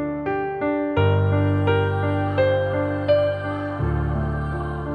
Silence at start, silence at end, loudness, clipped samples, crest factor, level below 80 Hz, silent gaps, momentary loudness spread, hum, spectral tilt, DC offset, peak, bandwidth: 0 s; 0 s; -22 LUFS; under 0.1%; 14 dB; -36 dBFS; none; 6 LU; none; -9.5 dB/octave; under 0.1%; -8 dBFS; 5 kHz